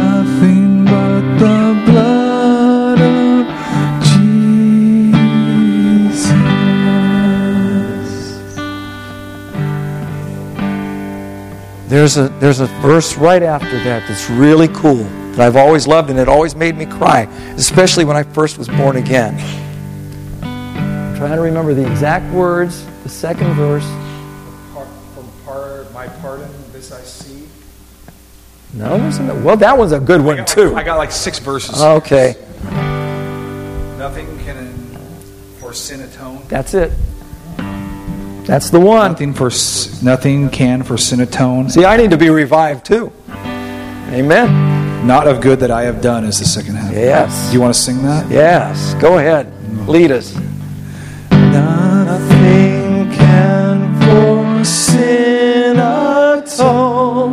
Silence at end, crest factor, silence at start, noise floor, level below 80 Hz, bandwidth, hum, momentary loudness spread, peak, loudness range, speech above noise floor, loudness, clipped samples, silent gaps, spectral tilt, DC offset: 0 s; 12 dB; 0 s; -40 dBFS; -34 dBFS; 15.5 kHz; none; 18 LU; 0 dBFS; 12 LU; 29 dB; -11 LUFS; under 0.1%; none; -6 dB/octave; under 0.1%